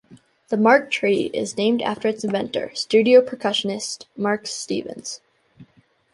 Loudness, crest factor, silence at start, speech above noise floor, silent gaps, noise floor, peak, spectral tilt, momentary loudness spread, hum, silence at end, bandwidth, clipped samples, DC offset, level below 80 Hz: -21 LUFS; 20 dB; 0.1 s; 37 dB; none; -58 dBFS; -2 dBFS; -4 dB/octave; 13 LU; none; 0.5 s; 11.5 kHz; under 0.1%; under 0.1%; -66 dBFS